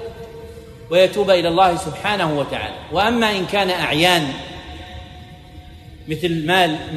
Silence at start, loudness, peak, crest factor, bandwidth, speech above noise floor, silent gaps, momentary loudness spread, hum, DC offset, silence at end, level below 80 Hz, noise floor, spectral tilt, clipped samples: 0 s; -18 LUFS; -2 dBFS; 18 dB; 13.5 kHz; 22 dB; none; 21 LU; none; under 0.1%; 0 s; -44 dBFS; -39 dBFS; -4.5 dB/octave; under 0.1%